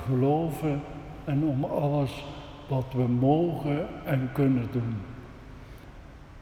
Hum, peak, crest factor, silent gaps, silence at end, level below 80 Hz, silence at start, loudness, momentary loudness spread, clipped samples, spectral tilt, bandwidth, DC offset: none; -10 dBFS; 18 dB; none; 0 s; -50 dBFS; 0 s; -28 LUFS; 22 LU; under 0.1%; -9 dB/octave; 15.5 kHz; under 0.1%